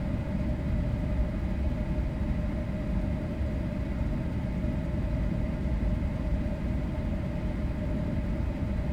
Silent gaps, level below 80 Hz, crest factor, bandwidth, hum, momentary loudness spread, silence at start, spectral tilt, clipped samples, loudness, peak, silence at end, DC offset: none; -32 dBFS; 12 dB; 8.8 kHz; none; 2 LU; 0 s; -9 dB/octave; under 0.1%; -32 LUFS; -16 dBFS; 0 s; under 0.1%